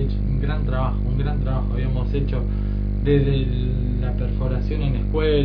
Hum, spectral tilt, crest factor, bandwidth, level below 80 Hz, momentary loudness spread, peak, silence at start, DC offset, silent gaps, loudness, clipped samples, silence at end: 50 Hz at -20 dBFS; -10.5 dB/octave; 14 dB; 5 kHz; -24 dBFS; 4 LU; -6 dBFS; 0 s; under 0.1%; none; -23 LUFS; under 0.1%; 0 s